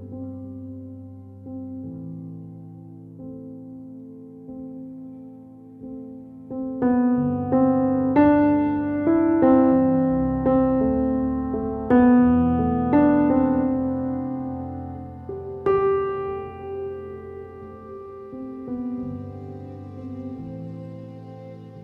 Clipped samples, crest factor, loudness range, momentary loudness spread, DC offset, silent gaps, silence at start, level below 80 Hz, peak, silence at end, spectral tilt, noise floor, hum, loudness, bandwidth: under 0.1%; 18 dB; 19 LU; 23 LU; under 0.1%; none; 0 s; -46 dBFS; -6 dBFS; 0 s; -11.5 dB/octave; -43 dBFS; none; -21 LUFS; 3.5 kHz